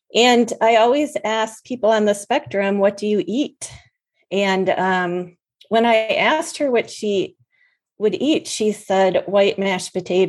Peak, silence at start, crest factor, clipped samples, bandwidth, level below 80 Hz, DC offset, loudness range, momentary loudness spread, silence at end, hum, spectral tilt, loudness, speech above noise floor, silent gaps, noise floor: -2 dBFS; 0.15 s; 18 dB; under 0.1%; 12.5 kHz; -66 dBFS; under 0.1%; 3 LU; 9 LU; 0 s; none; -4 dB/octave; -19 LUFS; 45 dB; none; -63 dBFS